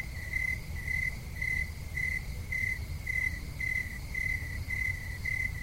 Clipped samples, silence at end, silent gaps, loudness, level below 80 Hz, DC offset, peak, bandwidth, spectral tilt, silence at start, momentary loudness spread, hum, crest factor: under 0.1%; 0 s; none; -33 LUFS; -42 dBFS; 0.1%; -20 dBFS; 16 kHz; -4 dB/octave; 0 s; 4 LU; none; 16 dB